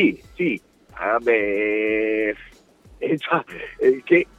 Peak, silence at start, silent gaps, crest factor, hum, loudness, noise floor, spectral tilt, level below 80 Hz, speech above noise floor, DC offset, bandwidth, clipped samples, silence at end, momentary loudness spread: -4 dBFS; 0 s; none; 18 dB; none; -22 LUFS; -50 dBFS; -7 dB/octave; -54 dBFS; 29 dB; under 0.1%; 7.8 kHz; under 0.1%; 0.15 s; 11 LU